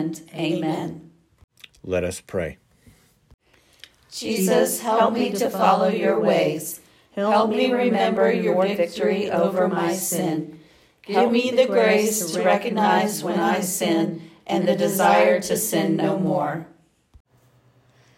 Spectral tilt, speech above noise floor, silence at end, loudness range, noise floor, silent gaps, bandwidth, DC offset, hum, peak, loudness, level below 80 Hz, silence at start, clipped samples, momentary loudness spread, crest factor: -4.5 dB/octave; 38 dB; 1.5 s; 8 LU; -58 dBFS; 1.44-1.48 s, 3.34-3.38 s; 16.5 kHz; under 0.1%; none; -4 dBFS; -21 LUFS; -60 dBFS; 0 s; under 0.1%; 11 LU; 18 dB